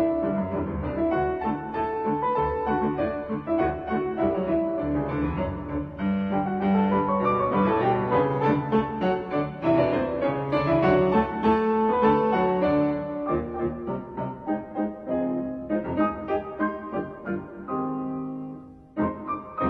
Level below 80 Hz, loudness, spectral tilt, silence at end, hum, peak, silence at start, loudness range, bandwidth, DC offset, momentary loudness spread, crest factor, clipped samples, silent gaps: -46 dBFS; -26 LUFS; -10 dB/octave; 0 s; none; -8 dBFS; 0 s; 6 LU; 5.8 kHz; under 0.1%; 10 LU; 16 dB; under 0.1%; none